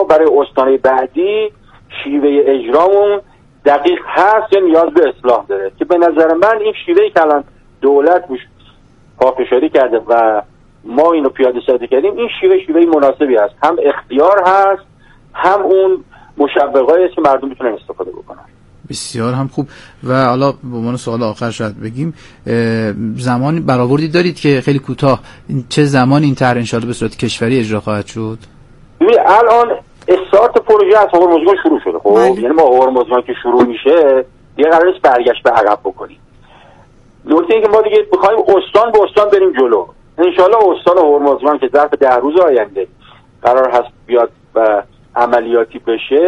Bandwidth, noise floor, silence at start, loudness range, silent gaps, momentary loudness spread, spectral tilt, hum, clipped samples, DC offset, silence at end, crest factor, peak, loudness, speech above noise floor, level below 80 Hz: 11.5 kHz; -44 dBFS; 0 s; 6 LU; none; 11 LU; -6.5 dB/octave; none; under 0.1%; under 0.1%; 0 s; 12 dB; 0 dBFS; -12 LUFS; 33 dB; -46 dBFS